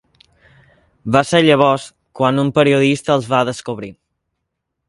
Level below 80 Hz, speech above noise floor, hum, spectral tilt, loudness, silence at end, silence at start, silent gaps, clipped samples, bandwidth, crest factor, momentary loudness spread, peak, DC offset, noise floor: -54 dBFS; 61 dB; none; -5.5 dB/octave; -15 LUFS; 0.95 s; 1.05 s; none; under 0.1%; 11.5 kHz; 18 dB; 16 LU; 0 dBFS; under 0.1%; -76 dBFS